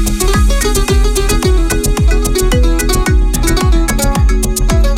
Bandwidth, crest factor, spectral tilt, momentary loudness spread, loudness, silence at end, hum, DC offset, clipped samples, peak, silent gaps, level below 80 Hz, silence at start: 16 kHz; 8 dB; -4.5 dB/octave; 1 LU; -13 LUFS; 0 s; none; under 0.1%; under 0.1%; -2 dBFS; none; -12 dBFS; 0 s